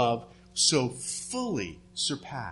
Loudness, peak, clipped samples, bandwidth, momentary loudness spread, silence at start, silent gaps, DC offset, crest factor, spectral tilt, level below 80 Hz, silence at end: -29 LUFS; -10 dBFS; under 0.1%; 11.5 kHz; 12 LU; 0 s; none; under 0.1%; 20 dB; -3 dB/octave; -60 dBFS; 0 s